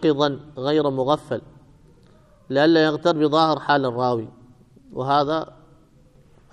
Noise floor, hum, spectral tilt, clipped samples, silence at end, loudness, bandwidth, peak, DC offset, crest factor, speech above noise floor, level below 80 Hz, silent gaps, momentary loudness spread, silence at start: -53 dBFS; none; -6.5 dB/octave; under 0.1%; 1.1 s; -21 LUFS; 9.8 kHz; -4 dBFS; under 0.1%; 20 dB; 33 dB; -58 dBFS; none; 13 LU; 0 s